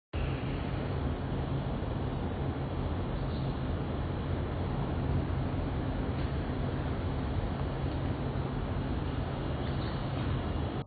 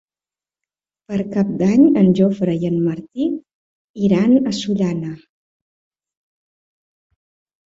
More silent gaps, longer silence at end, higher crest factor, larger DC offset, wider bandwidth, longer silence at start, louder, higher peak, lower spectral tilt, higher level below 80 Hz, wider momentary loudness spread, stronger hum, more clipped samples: second, none vs 3.54-3.94 s; second, 0 s vs 2.55 s; about the same, 12 dB vs 16 dB; neither; second, 4.9 kHz vs 7.8 kHz; second, 0.15 s vs 1.1 s; second, -34 LUFS vs -17 LUFS; second, -20 dBFS vs -2 dBFS; first, -11 dB/octave vs -7.5 dB/octave; first, -38 dBFS vs -56 dBFS; second, 1 LU vs 13 LU; neither; neither